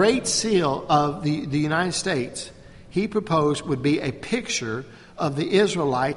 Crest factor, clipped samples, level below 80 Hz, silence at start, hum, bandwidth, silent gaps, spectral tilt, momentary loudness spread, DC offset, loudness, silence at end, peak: 18 dB; under 0.1%; -52 dBFS; 0 s; none; 11.5 kHz; none; -4.5 dB/octave; 10 LU; under 0.1%; -23 LUFS; 0 s; -6 dBFS